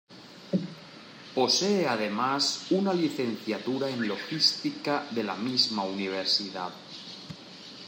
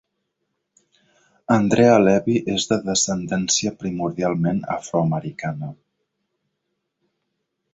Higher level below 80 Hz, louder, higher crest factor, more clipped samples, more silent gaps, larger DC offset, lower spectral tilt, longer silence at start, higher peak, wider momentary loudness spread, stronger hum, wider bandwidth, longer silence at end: second, -78 dBFS vs -56 dBFS; second, -28 LUFS vs -20 LUFS; about the same, 20 dB vs 20 dB; neither; neither; neither; about the same, -3.5 dB/octave vs -4.5 dB/octave; second, 0.1 s vs 1.5 s; second, -10 dBFS vs -2 dBFS; first, 19 LU vs 14 LU; neither; first, 16 kHz vs 8.2 kHz; second, 0 s vs 2 s